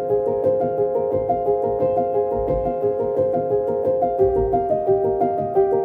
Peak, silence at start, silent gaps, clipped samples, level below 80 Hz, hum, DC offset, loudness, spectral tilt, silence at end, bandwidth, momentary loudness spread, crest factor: -6 dBFS; 0 s; none; under 0.1%; -42 dBFS; none; under 0.1%; -20 LUFS; -11 dB/octave; 0 s; 3.3 kHz; 3 LU; 14 dB